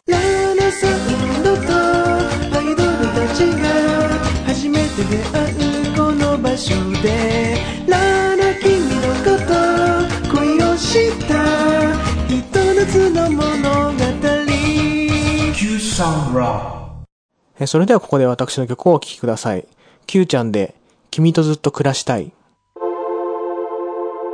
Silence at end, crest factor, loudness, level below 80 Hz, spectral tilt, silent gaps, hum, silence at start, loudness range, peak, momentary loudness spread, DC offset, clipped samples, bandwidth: 0 s; 14 dB; -16 LUFS; -32 dBFS; -5.5 dB/octave; 17.12-17.29 s; none; 0.1 s; 3 LU; -2 dBFS; 8 LU; under 0.1%; under 0.1%; 10.5 kHz